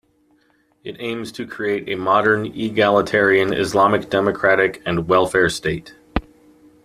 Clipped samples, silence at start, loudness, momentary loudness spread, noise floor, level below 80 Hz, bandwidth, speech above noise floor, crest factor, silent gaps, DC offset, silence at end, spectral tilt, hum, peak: under 0.1%; 0.85 s; -18 LUFS; 12 LU; -60 dBFS; -44 dBFS; 14.5 kHz; 42 dB; 16 dB; none; under 0.1%; 0.65 s; -5 dB/octave; none; -2 dBFS